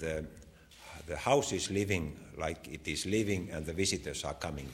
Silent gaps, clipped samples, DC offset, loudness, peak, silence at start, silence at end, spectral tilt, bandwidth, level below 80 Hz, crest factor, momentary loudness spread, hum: none; under 0.1%; under 0.1%; -34 LUFS; -12 dBFS; 0 s; 0 s; -4 dB/octave; 16 kHz; -52 dBFS; 22 dB; 13 LU; none